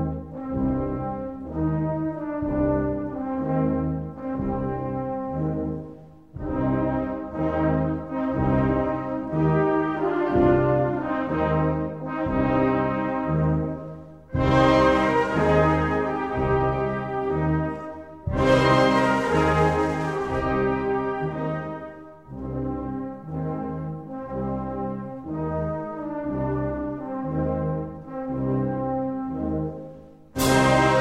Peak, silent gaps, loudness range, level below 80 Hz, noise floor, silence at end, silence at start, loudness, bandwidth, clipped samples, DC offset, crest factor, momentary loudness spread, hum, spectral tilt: -6 dBFS; none; 8 LU; -40 dBFS; -44 dBFS; 0 s; 0 s; -24 LUFS; 16 kHz; under 0.1%; 0.1%; 18 dB; 13 LU; none; -7 dB/octave